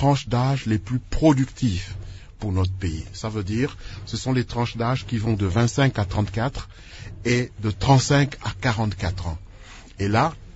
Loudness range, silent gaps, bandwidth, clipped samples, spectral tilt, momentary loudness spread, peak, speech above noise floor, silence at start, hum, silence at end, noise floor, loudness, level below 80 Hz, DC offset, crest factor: 4 LU; none; 8 kHz; under 0.1%; -6 dB/octave; 18 LU; -2 dBFS; 20 dB; 0 s; none; 0.05 s; -43 dBFS; -23 LUFS; -38 dBFS; under 0.1%; 20 dB